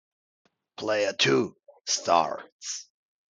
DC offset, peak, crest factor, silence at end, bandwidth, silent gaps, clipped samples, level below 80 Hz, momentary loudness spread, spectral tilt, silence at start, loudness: under 0.1%; -8 dBFS; 22 dB; 0.5 s; 10 kHz; 2.52-2.59 s; under 0.1%; -76 dBFS; 14 LU; -2.5 dB/octave; 0.8 s; -26 LUFS